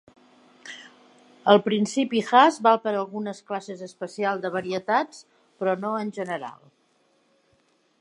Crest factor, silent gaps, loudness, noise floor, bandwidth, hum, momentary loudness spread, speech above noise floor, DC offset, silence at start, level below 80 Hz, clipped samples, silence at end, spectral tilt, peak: 24 dB; none; -24 LUFS; -66 dBFS; 11.5 kHz; none; 21 LU; 42 dB; under 0.1%; 0.65 s; -78 dBFS; under 0.1%; 1.5 s; -5 dB/octave; -2 dBFS